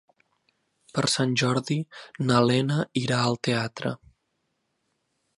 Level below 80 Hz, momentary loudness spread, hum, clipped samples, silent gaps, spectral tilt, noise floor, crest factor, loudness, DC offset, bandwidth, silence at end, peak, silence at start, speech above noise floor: -64 dBFS; 11 LU; none; under 0.1%; none; -5 dB/octave; -76 dBFS; 20 dB; -25 LUFS; under 0.1%; 11.5 kHz; 1.45 s; -6 dBFS; 0.95 s; 51 dB